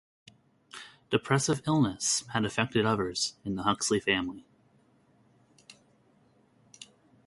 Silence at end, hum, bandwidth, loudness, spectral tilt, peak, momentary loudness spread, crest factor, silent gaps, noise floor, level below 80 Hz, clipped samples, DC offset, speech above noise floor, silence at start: 0.4 s; none; 11.5 kHz; -29 LUFS; -4 dB/octave; -10 dBFS; 22 LU; 22 dB; none; -65 dBFS; -62 dBFS; under 0.1%; under 0.1%; 36 dB; 0.75 s